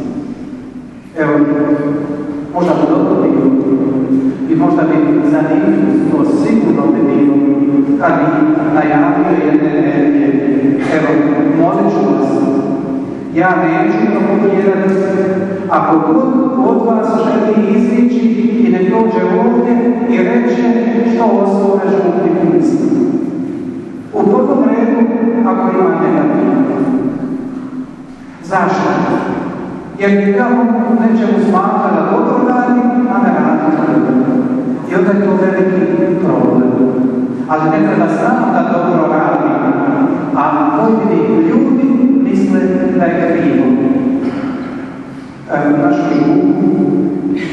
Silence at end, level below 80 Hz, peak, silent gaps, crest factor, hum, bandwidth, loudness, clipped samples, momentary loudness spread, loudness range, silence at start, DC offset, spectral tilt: 0 s; -50 dBFS; 0 dBFS; none; 12 dB; none; 8.6 kHz; -12 LUFS; under 0.1%; 7 LU; 3 LU; 0 s; under 0.1%; -8.5 dB/octave